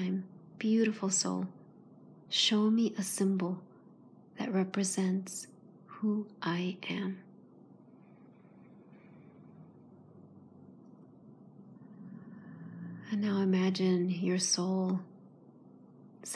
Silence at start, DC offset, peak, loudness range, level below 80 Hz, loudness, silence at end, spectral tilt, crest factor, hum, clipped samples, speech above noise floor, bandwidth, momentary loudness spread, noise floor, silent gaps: 0 s; under 0.1%; -16 dBFS; 18 LU; under -90 dBFS; -32 LUFS; 0 s; -4.5 dB/octave; 18 dB; none; under 0.1%; 26 dB; 11 kHz; 21 LU; -58 dBFS; none